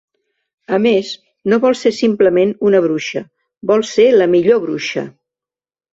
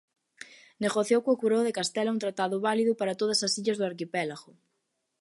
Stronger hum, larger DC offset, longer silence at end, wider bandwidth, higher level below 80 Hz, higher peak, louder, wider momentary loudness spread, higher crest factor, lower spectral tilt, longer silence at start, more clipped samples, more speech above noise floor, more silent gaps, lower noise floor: neither; neither; about the same, 0.85 s vs 0.8 s; second, 8 kHz vs 11.5 kHz; first, -60 dBFS vs -78 dBFS; first, -2 dBFS vs -12 dBFS; first, -14 LUFS vs -28 LUFS; second, 13 LU vs 18 LU; about the same, 14 dB vs 18 dB; first, -5.5 dB/octave vs -3.5 dB/octave; first, 0.7 s vs 0.4 s; neither; first, over 77 dB vs 52 dB; neither; first, under -90 dBFS vs -79 dBFS